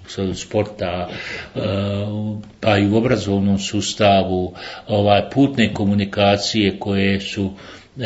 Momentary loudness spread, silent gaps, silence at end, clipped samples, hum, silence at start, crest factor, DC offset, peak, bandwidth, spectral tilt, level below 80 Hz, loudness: 11 LU; none; 0 s; under 0.1%; none; 0 s; 18 dB; under 0.1%; 0 dBFS; 8 kHz; -5.5 dB/octave; -50 dBFS; -19 LUFS